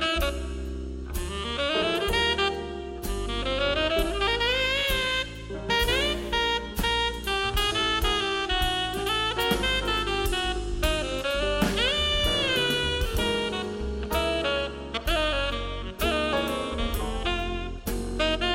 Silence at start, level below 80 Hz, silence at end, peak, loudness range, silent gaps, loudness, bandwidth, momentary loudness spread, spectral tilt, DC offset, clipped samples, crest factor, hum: 0 s; -34 dBFS; 0 s; -10 dBFS; 3 LU; none; -26 LUFS; 16.5 kHz; 9 LU; -3.5 dB/octave; under 0.1%; under 0.1%; 16 dB; none